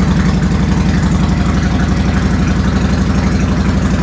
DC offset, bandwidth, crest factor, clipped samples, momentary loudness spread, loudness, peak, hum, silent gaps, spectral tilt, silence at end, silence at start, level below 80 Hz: under 0.1%; 8 kHz; 12 dB; under 0.1%; 1 LU; -13 LUFS; 0 dBFS; none; none; -7 dB/octave; 0 s; 0 s; -18 dBFS